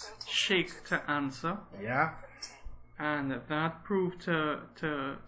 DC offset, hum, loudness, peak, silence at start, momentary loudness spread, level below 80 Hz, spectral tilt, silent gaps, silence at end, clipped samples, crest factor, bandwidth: under 0.1%; none; -33 LUFS; -14 dBFS; 0 s; 16 LU; -58 dBFS; -4.5 dB/octave; none; 0 s; under 0.1%; 20 dB; 8 kHz